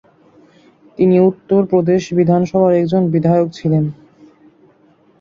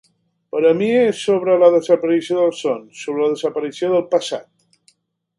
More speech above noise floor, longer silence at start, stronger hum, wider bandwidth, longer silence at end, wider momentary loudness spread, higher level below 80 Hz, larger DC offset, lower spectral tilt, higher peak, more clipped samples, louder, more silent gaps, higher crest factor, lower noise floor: second, 39 dB vs 43 dB; first, 1 s vs 0.55 s; neither; second, 7.2 kHz vs 11.5 kHz; first, 1.25 s vs 0.95 s; second, 4 LU vs 13 LU; first, -54 dBFS vs -70 dBFS; neither; first, -9 dB/octave vs -5.5 dB/octave; about the same, -2 dBFS vs 0 dBFS; neither; first, -14 LUFS vs -17 LUFS; neither; about the same, 14 dB vs 18 dB; second, -52 dBFS vs -60 dBFS